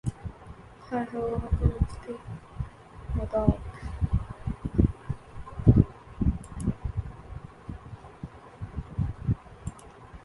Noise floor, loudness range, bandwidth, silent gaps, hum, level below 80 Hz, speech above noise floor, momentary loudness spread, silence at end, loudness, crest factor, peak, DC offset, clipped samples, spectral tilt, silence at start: -47 dBFS; 8 LU; 11.5 kHz; none; none; -36 dBFS; 20 dB; 18 LU; 0.05 s; -30 LUFS; 26 dB; -4 dBFS; under 0.1%; under 0.1%; -9.5 dB/octave; 0.05 s